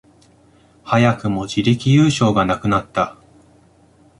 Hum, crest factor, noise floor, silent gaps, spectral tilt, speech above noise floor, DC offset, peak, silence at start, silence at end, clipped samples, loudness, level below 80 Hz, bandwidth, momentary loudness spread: none; 16 dB; -52 dBFS; none; -6.5 dB/octave; 36 dB; under 0.1%; -2 dBFS; 0.85 s; 1.05 s; under 0.1%; -17 LUFS; -46 dBFS; 11.5 kHz; 8 LU